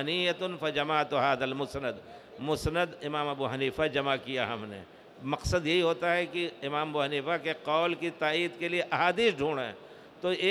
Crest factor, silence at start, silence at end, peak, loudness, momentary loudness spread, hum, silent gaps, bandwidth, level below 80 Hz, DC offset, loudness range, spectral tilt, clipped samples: 20 dB; 0 s; 0 s; -12 dBFS; -30 LUFS; 9 LU; none; none; 14.5 kHz; -54 dBFS; under 0.1%; 3 LU; -5 dB/octave; under 0.1%